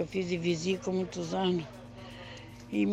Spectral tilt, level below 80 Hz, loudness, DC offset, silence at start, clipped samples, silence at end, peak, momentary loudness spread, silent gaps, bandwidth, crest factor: -5.5 dB/octave; -60 dBFS; -32 LUFS; under 0.1%; 0 s; under 0.1%; 0 s; -18 dBFS; 16 LU; none; 10 kHz; 14 dB